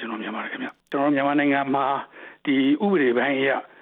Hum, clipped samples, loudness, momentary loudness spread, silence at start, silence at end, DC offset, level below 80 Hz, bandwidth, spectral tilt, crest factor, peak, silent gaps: none; under 0.1%; -23 LUFS; 11 LU; 0 s; 0.15 s; under 0.1%; -78 dBFS; 4.1 kHz; -8.5 dB/octave; 14 dB; -8 dBFS; none